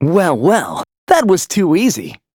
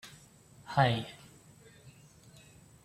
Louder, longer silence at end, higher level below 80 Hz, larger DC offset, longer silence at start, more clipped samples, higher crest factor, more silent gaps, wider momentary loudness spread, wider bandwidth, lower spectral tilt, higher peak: first, -14 LUFS vs -30 LUFS; second, 0.2 s vs 0.95 s; first, -54 dBFS vs -66 dBFS; neither; about the same, 0 s vs 0.05 s; neither; second, 14 dB vs 26 dB; first, 0.98-1.07 s vs none; second, 12 LU vs 28 LU; first, 20 kHz vs 15 kHz; about the same, -5 dB/octave vs -6 dB/octave; first, 0 dBFS vs -12 dBFS